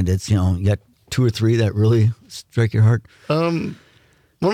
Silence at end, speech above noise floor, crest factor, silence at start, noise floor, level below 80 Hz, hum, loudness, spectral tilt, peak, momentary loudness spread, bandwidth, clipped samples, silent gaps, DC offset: 0 s; 38 dB; 12 dB; 0 s; -56 dBFS; -48 dBFS; none; -19 LUFS; -7 dB/octave; -8 dBFS; 10 LU; 13.5 kHz; under 0.1%; none; under 0.1%